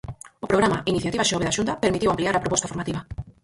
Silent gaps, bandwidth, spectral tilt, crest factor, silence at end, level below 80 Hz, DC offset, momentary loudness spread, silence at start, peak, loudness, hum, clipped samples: none; 11.5 kHz; -4 dB/octave; 20 dB; 0.15 s; -46 dBFS; under 0.1%; 11 LU; 0.05 s; -4 dBFS; -23 LUFS; none; under 0.1%